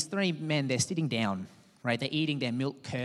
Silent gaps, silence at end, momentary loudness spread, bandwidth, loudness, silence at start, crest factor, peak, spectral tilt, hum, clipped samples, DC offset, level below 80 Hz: none; 0 s; 6 LU; 13 kHz; -31 LUFS; 0 s; 18 dB; -14 dBFS; -4.5 dB/octave; none; under 0.1%; under 0.1%; -72 dBFS